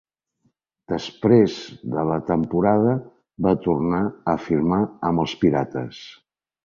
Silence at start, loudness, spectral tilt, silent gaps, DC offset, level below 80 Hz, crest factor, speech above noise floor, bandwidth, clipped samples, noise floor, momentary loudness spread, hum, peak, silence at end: 0.9 s; -22 LUFS; -8 dB/octave; none; under 0.1%; -50 dBFS; 18 dB; 48 dB; 7.4 kHz; under 0.1%; -69 dBFS; 12 LU; none; -4 dBFS; 0.55 s